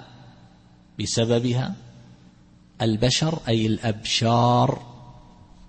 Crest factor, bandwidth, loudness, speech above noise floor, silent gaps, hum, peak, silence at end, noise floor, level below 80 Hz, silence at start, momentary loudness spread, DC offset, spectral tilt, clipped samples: 18 dB; 8.8 kHz; -22 LUFS; 31 dB; none; none; -8 dBFS; 0.5 s; -52 dBFS; -50 dBFS; 0 s; 14 LU; under 0.1%; -5 dB/octave; under 0.1%